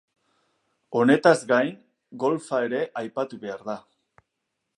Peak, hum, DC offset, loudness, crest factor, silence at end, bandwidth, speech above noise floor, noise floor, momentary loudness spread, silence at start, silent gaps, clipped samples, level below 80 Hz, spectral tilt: -2 dBFS; none; under 0.1%; -24 LUFS; 22 dB; 1 s; 11.5 kHz; 57 dB; -80 dBFS; 16 LU; 0.9 s; none; under 0.1%; -78 dBFS; -5.5 dB/octave